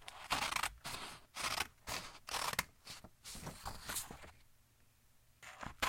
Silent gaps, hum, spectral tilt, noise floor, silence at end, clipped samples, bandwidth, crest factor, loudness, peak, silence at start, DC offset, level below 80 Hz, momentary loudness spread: none; none; -1 dB/octave; -69 dBFS; 0 s; under 0.1%; 16.5 kHz; 28 dB; -42 LUFS; -16 dBFS; 0 s; under 0.1%; -62 dBFS; 15 LU